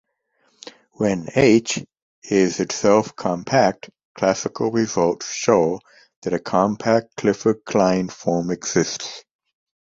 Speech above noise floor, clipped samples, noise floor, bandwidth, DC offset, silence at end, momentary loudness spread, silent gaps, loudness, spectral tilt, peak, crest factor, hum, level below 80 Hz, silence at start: 46 dB; under 0.1%; -66 dBFS; 8 kHz; under 0.1%; 0.7 s; 9 LU; 2.02-2.22 s, 4.05-4.15 s, 6.16-6.22 s; -20 LUFS; -5 dB/octave; -2 dBFS; 20 dB; none; -56 dBFS; 1 s